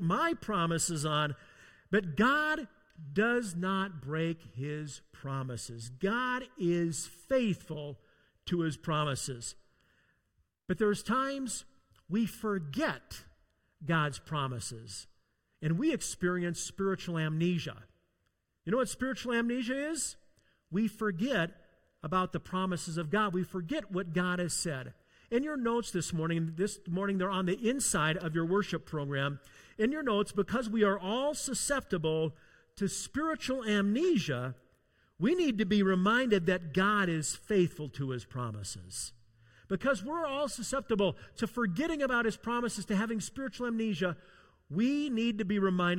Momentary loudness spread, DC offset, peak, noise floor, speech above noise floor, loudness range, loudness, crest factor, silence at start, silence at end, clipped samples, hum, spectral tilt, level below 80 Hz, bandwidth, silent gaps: 11 LU; under 0.1%; -14 dBFS; -79 dBFS; 47 dB; 5 LU; -33 LUFS; 18 dB; 0 s; 0 s; under 0.1%; none; -5 dB/octave; -60 dBFS; 16.5 kHz; none